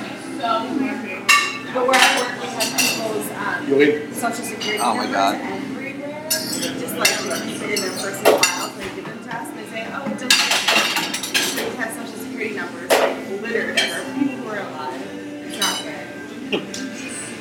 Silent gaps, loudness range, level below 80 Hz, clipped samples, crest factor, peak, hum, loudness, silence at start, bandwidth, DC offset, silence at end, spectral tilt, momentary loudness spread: none; 5 LU; -64 dBFS; under 0.1%; 22 dB; 0 dBFS; none; -20 LUFS; 0 s; 19 kHz; under 0.1%; 0 s; -2 dB/octave; 14 LU